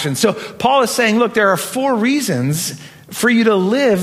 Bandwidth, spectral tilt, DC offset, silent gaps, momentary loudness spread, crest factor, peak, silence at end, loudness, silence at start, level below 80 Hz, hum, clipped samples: 16 kHz; -4.5 dB/octave; under 0.1%; none; 7 LU; 14 dB; 0 dBFS; 0 s; -15 LUFS; 0 s; -58 dBFS; none; under 0.1%